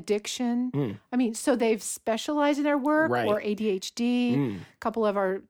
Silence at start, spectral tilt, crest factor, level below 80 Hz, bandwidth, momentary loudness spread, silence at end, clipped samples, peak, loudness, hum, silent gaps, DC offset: 0 s; -5 dB/octave; 16 dB; -68 dBFS; 18 kHz; 6 LU; 0.1 s; under 0.1%; -12 dBFS; -27 LUFS; none; none; under 0.1%